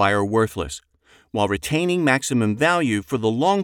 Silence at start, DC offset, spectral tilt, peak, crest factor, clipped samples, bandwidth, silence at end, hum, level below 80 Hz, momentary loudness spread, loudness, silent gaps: 0 s; under 0.1%; -5 dB/octave; -4 dBFS; 18 dB; under 0.1%; 19 kHz; 0 s; none; -48 dBFS; 11 LU; -21 LUFS; none